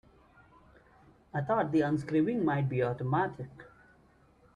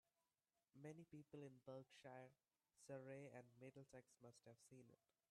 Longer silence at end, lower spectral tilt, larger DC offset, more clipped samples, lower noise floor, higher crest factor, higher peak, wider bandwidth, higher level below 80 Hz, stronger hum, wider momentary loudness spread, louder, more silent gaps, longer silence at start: first, 0.9 s vs 0.35 s; first, -9 dB/octave vs -6 dB/octave; neither; neither; second, -63 dBFS vs under -90 dBFS; about the same, 16 dB vs 18 dB; first, -16 dBFS vs -46 dBFS; second, 10 kHz vs 12 kHz; first, -64 dBFS vs under -90 dBFS; neither; about the same, 10 LU vs 9 LU; first, -31 LUFS vs -63 LUFS; neither; first, 1.35 s vs 0.75 s